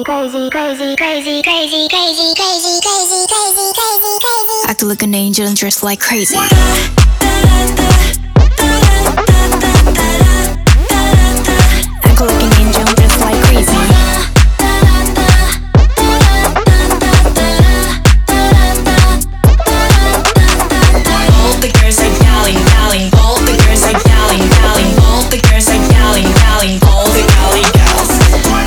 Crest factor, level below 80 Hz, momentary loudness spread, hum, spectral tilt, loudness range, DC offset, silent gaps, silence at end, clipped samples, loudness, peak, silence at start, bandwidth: 8 dB; -12 dBFS; 3 LU; none; -4 dB/octave; 2 LU; under 0.1%; none; 0 s; 0.5%; -9 LUFS; 0 dBFS; 0 s; over 20 kHz